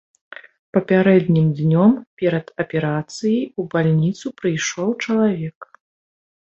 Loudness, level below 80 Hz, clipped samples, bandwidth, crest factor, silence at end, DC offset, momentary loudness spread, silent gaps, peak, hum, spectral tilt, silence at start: -19 LUFS; -60 dBFS; under 0.1%; 8 kHz; 16 dB; 0.95 s; under 0.1%; 9 LU; 2.07-2.17 s, 5.55-5.61 s; -2 dBFS; none; -6.5 dB/octave; 0.75 s